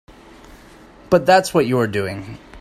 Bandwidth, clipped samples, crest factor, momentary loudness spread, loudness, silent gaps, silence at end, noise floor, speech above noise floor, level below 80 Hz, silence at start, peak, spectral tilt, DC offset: 15 kHz; under 0.1%; 18 dB; 17 LU; -17 LUFS; none; 0 s; -44 dBFS; 28 dB; -48 dBFS; 0.5 s; -2 dBFS; -5.5 dB/octave; under 0.1%